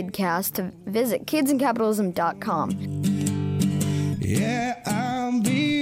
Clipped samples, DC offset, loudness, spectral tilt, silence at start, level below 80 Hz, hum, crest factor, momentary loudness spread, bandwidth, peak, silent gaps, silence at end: under 0.1%; under 0.1%; -24 LUFS; -5.5 dB/octave; 0 s; -56 dBFS; none; 16 dB; 5 LU; 16 kHz; -8 dBFS; none; 0 s